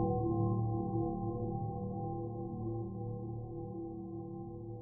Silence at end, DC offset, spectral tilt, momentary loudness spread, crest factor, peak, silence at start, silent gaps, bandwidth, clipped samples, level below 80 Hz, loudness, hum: 0 s; under 0.1%; -15.5 dB/octave; 11 LU; 16 dB; -22 dBFS; 0 s; none; 1.2 kHz; under 0.1%; -54 dBFS; -39 LUFS; none